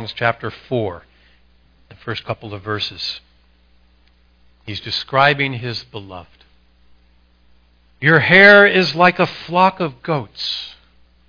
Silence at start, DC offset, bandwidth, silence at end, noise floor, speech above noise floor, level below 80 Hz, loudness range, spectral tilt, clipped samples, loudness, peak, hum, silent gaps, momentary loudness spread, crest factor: 0 s; under 0.1%; 5.4 kHz; 0.6 s; -54 dBFS; 38 dB; -54 dBFS; 15 LU; -6 dB/octave; under 0.1%; -15 LUFS; 0 dBFS; 60 Hz at -55 dBFS; none; 22 LU; 18 dB